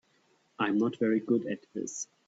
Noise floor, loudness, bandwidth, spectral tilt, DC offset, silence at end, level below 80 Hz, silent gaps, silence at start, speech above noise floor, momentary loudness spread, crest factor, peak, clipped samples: -69 dBFS; -31 LUFS; 8 kHz; -5 dB/octave; under 0.1%; 0.25 s; -76 dBFS; none; 0.6 s; 39 dB; 10 LU; 18 dB; -14 dBFS; under 0.1%